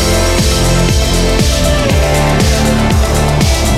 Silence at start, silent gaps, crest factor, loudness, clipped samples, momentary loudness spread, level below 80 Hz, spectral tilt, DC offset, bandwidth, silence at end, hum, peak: 0 s; none; 10 dB; -11 LUFS; under 0.1%; 1 LU; -14 dBFS; -4.5 dB/octave; under 0.1%; 16 kHz; 0 s; none; 0 dBFS